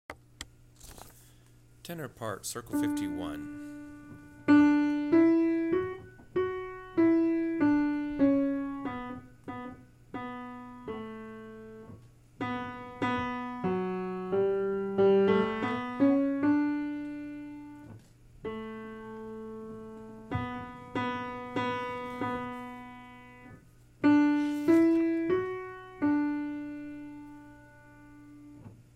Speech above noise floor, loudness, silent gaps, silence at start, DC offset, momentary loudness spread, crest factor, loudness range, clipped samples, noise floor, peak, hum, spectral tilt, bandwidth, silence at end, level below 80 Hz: 23 dB; -29 LUFS; none; 0.1 s; under 0.1%; 23 LU; 18 dB; 13 LU; under 0.1%; -58 dBFS; -12 dBFS; none; -6.5 dB/octave; 14.5 kHz; 0.15 s; -60 dBFS